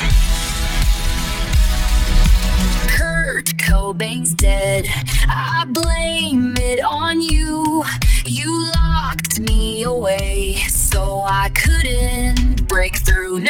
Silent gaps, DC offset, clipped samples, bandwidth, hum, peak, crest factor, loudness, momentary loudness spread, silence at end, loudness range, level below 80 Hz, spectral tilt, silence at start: none; under 0.1%; under 0.1%; 17.5 kHz; none; -2 dBFS; 12 dB; -18 LUFS; 3 LU; 0 s; 1 LU; -18 dBFS; -4 dB/octave; 0 s